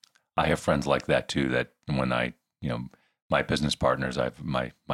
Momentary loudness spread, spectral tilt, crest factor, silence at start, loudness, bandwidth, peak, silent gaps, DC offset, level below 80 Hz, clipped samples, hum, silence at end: 8 LU; -5.5 dB/octave; 20 dB; 0.35 s; -28 LUFS; 13.5 kHz; -8 dBFS; 3.22-3.29 s; under 0.1%; -48 dBFS; under 0.1%; none; 0 s